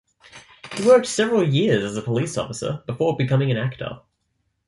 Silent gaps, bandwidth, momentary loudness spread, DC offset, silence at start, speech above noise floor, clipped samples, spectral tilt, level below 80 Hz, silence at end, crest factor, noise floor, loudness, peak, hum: none; 11.5 kHz; 14 LU; under 0.1%; 0.35 s; 52 dB; under 0.1%; -5.5 dB/octave; -56 dBFS; 0.7 s; 18 dB; -72 dBFS; -21 LUFS; -4 dBFS; none